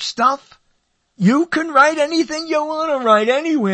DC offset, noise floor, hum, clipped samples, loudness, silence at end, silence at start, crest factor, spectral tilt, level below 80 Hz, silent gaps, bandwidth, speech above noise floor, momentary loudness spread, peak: under 0.1%; -65 dBFS; none; under 0.1%; -16 LUFS; 0 s; 0 s; 16 dB; -5 dB/octave; -64 dBFS; none; 8.8 kHz; 48 dB; 7 LU; 0 dBFS